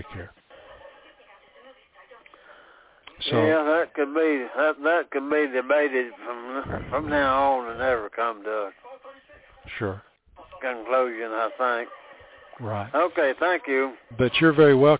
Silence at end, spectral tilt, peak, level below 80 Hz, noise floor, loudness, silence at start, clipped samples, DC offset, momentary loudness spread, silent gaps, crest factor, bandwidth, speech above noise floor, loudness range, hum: 0 s; -9.5 dB/octave; -6 dBFS; -54 dBFS; -54 dBFS; -24 LUFS; 0 s; under 0.1%; under 0.1%; 14 LU; none; 18 dB; 4 kHz; 30 dB; 7 LU; none